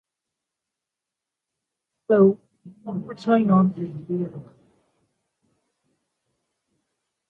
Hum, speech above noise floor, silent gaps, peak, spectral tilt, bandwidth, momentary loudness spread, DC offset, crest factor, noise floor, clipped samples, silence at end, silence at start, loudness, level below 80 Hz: none; 65 dB; none; -6 dBFS; -10 dB/octave; 4.8 kHz; 16 LU; under 0.1%; 20 dB; -86 dBFS; under 0.1%; 2.85 s; 2.1 s; -22 LUFS; -66 dBFS